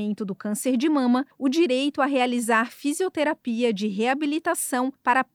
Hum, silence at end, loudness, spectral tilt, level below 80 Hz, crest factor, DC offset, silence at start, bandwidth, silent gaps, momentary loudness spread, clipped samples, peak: none; 0.1 s; -24 LUFS; -4 dB/octave; -78 dBFS; 16 dB; under 0.1%; 0 s; 18 kHz; none; 5 LU; under 0.1%; -8 dBFS